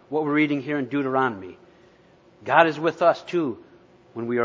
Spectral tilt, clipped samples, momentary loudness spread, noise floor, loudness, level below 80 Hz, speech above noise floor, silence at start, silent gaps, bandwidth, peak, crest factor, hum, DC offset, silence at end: -7 dB/octave; under 0.1%; 20 LU; -55 dBFS; -23 LUFS; -68 dBFS; 32 dB; 0.1 s; none; 7.6 kHz; 0 dBFS; 24 dB; none; under 0.1%; 0 s